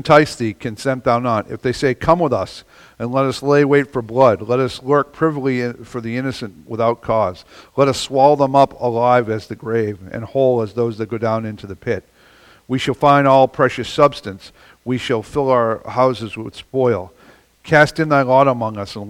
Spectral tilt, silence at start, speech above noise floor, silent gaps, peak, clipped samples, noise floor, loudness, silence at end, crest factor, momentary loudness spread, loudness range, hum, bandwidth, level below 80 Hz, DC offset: -6 dB/octave; 0.05 s; 32 dB; none; 0 dBFS; under 0.1%; -48 dBFS; -17 LUFS; 0 s; 18 dB; 13 LU; 4 LU; none; 15 kHz; -48 dBFS; under 0.1%